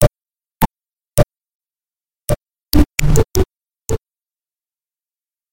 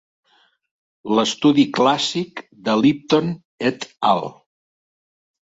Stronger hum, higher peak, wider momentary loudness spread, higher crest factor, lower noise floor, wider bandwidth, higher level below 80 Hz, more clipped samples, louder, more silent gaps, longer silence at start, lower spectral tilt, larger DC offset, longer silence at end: neither; about the same, 0 dBFS vs -2 dBFS; about the same, 10 LU vs 12 LU; about the same, 18 dB vs 18 dB; about the same, under -90 dBFS vs under -90 dBFS; first, 17 kHz vs 8 kHz; first, -24 dBFS vs -62 dBFS; neither; about the same, -19 LUFS vs -19 LUFS; second, 1.54-1.60 s vs 3.45-3.58 s; second, 0 s vs 1.05 s; about the same, -5.5 dB/octave vs -5 dB/octave; neither; second, 0 s vs 1.25 s